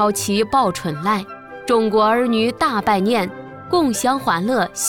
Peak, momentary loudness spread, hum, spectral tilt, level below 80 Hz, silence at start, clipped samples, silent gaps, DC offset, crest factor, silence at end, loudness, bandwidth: -6 dBFS; 7 LU; none; -4 dB/octave; -52 dBFS; 0 s; under 0.1%; none; 0.2%; 14 dB; 0 s; -18 LUFS; 19.5 kHz